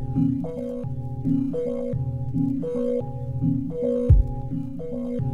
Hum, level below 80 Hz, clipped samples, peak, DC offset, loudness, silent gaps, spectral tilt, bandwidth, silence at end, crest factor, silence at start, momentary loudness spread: none; -30 dBFS; under 0.1%; -6 dBFS; under 0.1%; -26 LUFS; none; -11.5 dB/octave; 9.6 kHz; 0 s; 18 dB; 0 s; 11 LU